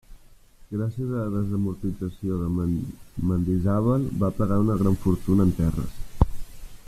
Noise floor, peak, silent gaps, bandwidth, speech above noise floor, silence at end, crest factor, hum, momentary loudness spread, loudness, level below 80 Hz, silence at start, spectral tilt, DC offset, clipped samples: -50 dBFS; -4 dBFS; none; 14.5 kHz; 26 dB; 0.1 s; 20 dB; none; 9 LU; -25 LUFS; -36 dBFS; 0.1 s; -9.5 dB/octave; under 0.1%; under 0.1%